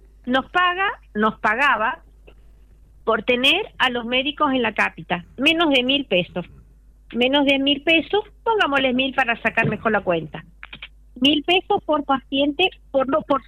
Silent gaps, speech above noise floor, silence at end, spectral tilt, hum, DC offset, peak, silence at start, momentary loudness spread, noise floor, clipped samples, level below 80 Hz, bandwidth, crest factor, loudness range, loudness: none; 29 dB; 0.05 s; -5 dB/octave; none; under 0.1%; -6 dBFS; 0.25 s; 11 LU; -49 dBFS; under 0.1%; -48 dBFS; 15 kHz; 16 dB; 2 LU; -19 LUFS